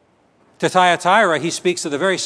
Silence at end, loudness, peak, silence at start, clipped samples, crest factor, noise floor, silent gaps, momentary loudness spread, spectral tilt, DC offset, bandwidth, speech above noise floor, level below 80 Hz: 0 s; -16 LUFS; 0 dBFS; 0.6 s; under 0.1%; 18 dB; -56 dBFS; none; 6 LU; -3.5 dB/octave; under 0.1%; 11 kHz; 40 dB; -70 dBFS